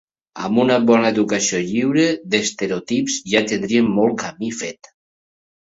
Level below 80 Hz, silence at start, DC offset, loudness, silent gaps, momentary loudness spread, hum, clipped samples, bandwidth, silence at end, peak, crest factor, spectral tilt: -58 dBFS; 0.35 s; under 0.1%; -18 LUFS; none; 11 LU; none; under 0.1%; 8 kHz; 1.05 s; -2 dBFS; 18 dB; -4 dB/octave